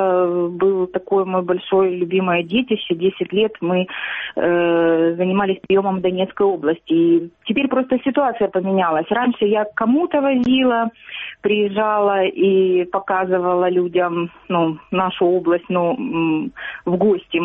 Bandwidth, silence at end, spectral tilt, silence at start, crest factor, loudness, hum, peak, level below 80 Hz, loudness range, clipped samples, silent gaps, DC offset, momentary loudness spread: 3.9 kHz; 0 s; -4.5 dB/octave; 0 s; 12 dB; -18 LUFS; none; -4 dBFS; -58 dBFS; 1 LU; under 0.1%; none; under 0.1%; 5 LU